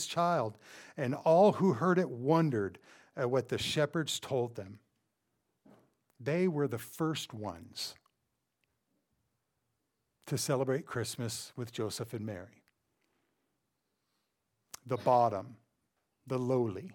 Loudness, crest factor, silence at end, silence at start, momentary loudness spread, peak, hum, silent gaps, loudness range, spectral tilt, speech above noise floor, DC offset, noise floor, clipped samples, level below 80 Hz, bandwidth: -33 LUFS; 20 dB; 0 s; 0 s; 15 LU; -14 dBFS; none; none; 12 LU; -5.5 dB/octave; 51 dB; under 0.1%; -83 dBFS; under 0.1%; -74 dBFS; 19 kHz